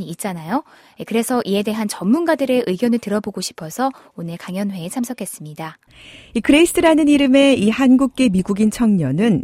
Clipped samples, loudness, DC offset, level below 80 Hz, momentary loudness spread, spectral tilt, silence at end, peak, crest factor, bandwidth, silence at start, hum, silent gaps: under 0.1%; -17 LUFS; under 0.1%; -48 dBFS; 16 LU; -5.5 dB/octave; 0 s; 0 dBFS; 16 dB; 16 kHz; 0 s; none; none